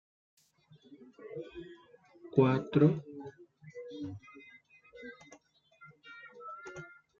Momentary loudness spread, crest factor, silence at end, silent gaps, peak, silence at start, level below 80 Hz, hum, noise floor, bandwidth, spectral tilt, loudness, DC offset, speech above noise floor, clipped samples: 26 LU; 24 dB; 0.35 s; none; -12 dBFS; 0.9 s; -72 dBFS; none; -64 dBFS; 7.2 kHz; -8 dB/octave; -32 LUFS; under 0.1%; 35 dB; under 0.1%